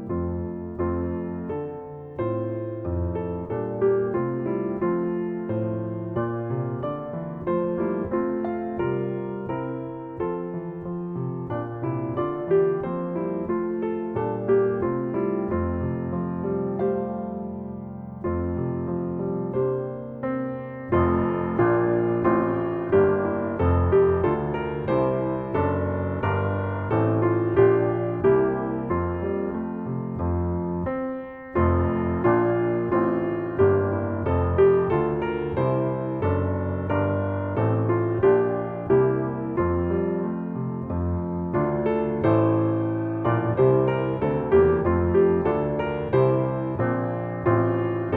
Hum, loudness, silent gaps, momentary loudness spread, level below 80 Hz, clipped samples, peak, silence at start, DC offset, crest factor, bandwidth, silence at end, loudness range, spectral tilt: none; -25 LUFS; none; 10 LU; -44 dBFS; under 0.1%; -8 dBFS; 0 s; under 0.1%; 16 dB; 4 kHz; 0 s; 6 LU; -12 dB/octave